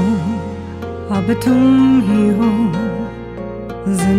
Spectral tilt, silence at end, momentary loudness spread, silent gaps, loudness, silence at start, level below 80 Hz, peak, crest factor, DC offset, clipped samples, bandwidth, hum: -7 dB/octave; 0 s; 15 LU; none; -15 LUFS; 0 s; -38 dBFS; -4 dBFS; 12 dB; under 0.1%; under 0.1%; 14.5 kHz; none